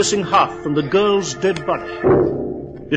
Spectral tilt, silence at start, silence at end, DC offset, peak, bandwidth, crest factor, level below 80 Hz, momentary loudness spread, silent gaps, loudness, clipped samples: -4.5 dB/octave; 0 s; 0 s; under 0.1%; -2 dBFS; 9.8 kHz; 16 dB; -44 dBFS; 9 LU; none; -18 LUFS; under 0.1%